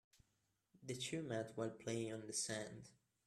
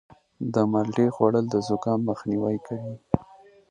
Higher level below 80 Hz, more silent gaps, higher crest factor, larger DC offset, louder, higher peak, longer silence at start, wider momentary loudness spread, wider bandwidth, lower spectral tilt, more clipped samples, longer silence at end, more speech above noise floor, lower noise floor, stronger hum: second, -82 dBFS vs -56 dBFS; neither; about the same, 18 dB vs 20 dB; neither; second, -45 LUFS vs -25 LUFS; second, -30 dBFS vs -4 dBFS; first, 0.75 s vs 0.4 s; first, 14 LU vs 9 LU; first, 14.5 kHz vs 9.8 kHz; second, -3.5 dB/octave vs -8 dB/octave; neither; about the same, 0.35 s vs 0.45 s; first, 39 dB vs 27 dB; first, -84 dBFS vs -52 dBFS; neither